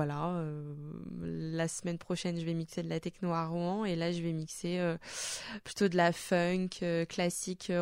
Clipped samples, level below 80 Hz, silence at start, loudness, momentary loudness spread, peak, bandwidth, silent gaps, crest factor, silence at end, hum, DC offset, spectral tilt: under 0.1%; -64 dBFS; 0 s; -35 LUFS; 10 LU; -16 dBFS; 16 kHz; none; 18 dB; 0 s; none; under 0.1%; -5 dB/octave